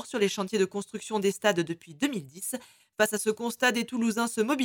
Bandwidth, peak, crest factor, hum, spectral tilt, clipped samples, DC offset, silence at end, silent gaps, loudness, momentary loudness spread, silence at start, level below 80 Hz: 19.5 kHz; -8 dBFS; 20 dB; none; -3.5 dB/octave; under 0.1%; under 0.1%; 0 s; none; -29 LUFS; 9 LU; 0 s; -74 dBFS